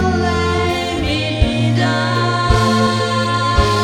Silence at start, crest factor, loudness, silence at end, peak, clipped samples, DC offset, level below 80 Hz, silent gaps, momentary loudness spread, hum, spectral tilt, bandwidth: 0 s; 16 dB; -16 LUFS; 0 s; 0 dBFS; under 0.1%; under 0.1%; -26 dBFS; none; 4 LU; none; -5.5 dB/octave; 14 kHz